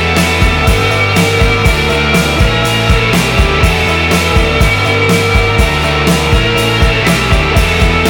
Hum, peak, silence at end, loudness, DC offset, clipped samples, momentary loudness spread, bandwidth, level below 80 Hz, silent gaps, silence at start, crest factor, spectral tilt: none; 0 dBFS; 0 s; -10 LUFS; under 0.1%; under 0.1%; 1 LU; over 20 kHz; -16 dBFS; none; 0 s; 10 dB; -4.5 dB/octave